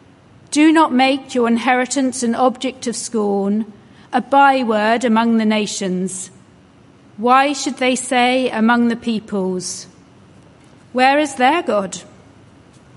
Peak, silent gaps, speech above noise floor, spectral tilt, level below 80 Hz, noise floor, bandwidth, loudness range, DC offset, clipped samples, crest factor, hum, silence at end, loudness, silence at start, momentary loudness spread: 0 dBFS; none; 31 dB; -4 dB/octave; -60 dBFS; -47 dBFS; 11.5 kHz; 3 LU; under 0.1%; under 0.1%; 16 dB; none; 0.9 s; -16 LUFS; 0.5 s; 11 LU